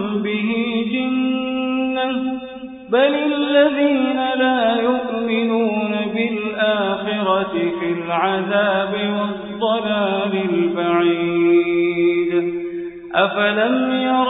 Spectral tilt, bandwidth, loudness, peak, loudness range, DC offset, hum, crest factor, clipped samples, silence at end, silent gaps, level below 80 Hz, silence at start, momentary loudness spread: -10.5 dB/octave; 4 kHz; -19 LUFS; -2 dBFS; 2 LU; under 0.1%; none; 16 dB; under 0.1%; 0 s; none; -58 dBFS; 0 s; 6 LU